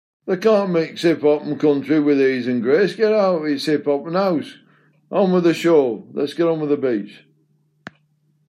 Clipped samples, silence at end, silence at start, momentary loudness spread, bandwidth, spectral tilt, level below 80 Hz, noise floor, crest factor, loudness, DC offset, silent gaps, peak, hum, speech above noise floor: under 0.1%; 1.35 s; 0.25 s; 9 LU; 14 kHz; -7 dB/octave; -72 dBFS; -63 dBFS; 16 dB; -18 LUFS; under 0.1%; none; -4 dBFS; none; 45 dB